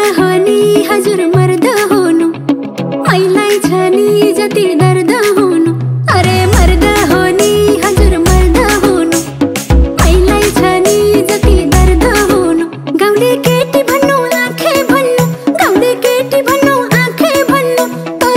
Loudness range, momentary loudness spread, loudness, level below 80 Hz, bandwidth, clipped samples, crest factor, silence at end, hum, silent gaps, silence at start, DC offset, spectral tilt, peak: 1 LU; 4 LU; -10 LUFS; -18 dBFS; 16.5 kHz; 0.6%; 8 dB; 0 s; none; none; 0 s; under 0.1%; -5 dB/octave; 0 dBFS